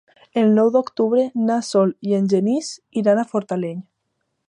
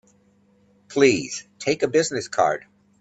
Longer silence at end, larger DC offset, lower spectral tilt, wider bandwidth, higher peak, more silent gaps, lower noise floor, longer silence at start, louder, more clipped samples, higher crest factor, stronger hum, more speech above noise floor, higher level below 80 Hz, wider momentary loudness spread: first, 0.7 s vs 0.4 s; neither; first, -6.5 dB/octave vs -4 dB/octave; first, 11 kHz vs 8.6 kHz; about the same, -4 dBFS vs -4 dBFS; neither; first, -74 dBFS vs -60 dBFS; second, 0.35 s vs 0.9 s; first, -19 LUFS vs -22 LUFS; neither; about the same, 16 dB vs 20 dB; neither; first, 55 dB vs 39 dB; second, -72 dBFS vs -64 dBFS; about the same, 10 LU vs 12 LU